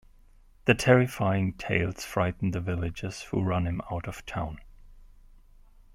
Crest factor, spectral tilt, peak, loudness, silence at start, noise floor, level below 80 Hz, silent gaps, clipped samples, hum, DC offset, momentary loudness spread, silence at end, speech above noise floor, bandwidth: 24 dB; -6 dB/octave; -6 dBFS; -28 LUFS; 0.65 s; -56 dBFS; -50 dBFS; none; under 0.1%; none; under 0.1%; 13 LU; 0.85 s; 29 dB; 16 kHz